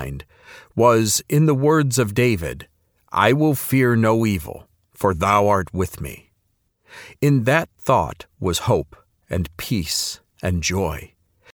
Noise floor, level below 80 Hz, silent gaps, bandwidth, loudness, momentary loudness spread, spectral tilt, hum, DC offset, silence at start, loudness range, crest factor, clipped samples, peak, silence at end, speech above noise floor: -68 dBFS; -42 dBFS; none; over 20 kHz; -20 LUFS; 14 LU; -5 dB/octave; none; under 0.1%; 0 s; 4 LU; 20 dB; under 0.1%; 0 dBFS; 0.5 s; 49 dB